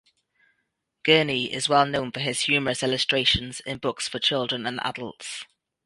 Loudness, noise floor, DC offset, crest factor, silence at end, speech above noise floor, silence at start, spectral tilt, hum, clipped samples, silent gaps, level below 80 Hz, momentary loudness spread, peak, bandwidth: -23 LUFS; -77 dBFS; under 0.1%; 22 dB; 0.4 s; 52 dB; 1.05 s; -3 dB/octave; none; under 0.1%; none; -52 dBFS; 14 LU; -4 dBFS; 11.5 kHz